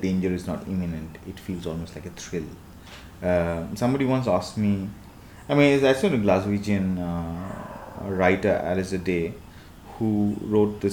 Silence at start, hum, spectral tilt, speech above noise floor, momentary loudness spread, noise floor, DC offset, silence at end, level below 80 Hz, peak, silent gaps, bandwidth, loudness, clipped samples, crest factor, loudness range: 0 s; none; -7 dB/octave; 20 dB; 18 LU; -44 dBFS; under 0.1%; 0 s; -48 dBFS; -4 dBFS; none; 19 kHz; -25 LUFS; under 0.1%; 20 dB; 7 LU